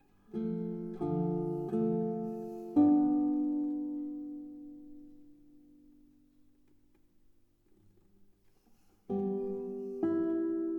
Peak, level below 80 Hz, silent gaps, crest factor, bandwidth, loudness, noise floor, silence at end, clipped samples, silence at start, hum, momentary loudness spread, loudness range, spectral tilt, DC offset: -16 dBFS; -70 dBFS; none; 18 dB; 2.6 kHz; -33 LUFS; -66 dBFS; 0 s; under 0.1%; 0.3 s; none; 17 LU; 16 LU; -11 dB/octave; under 0.1%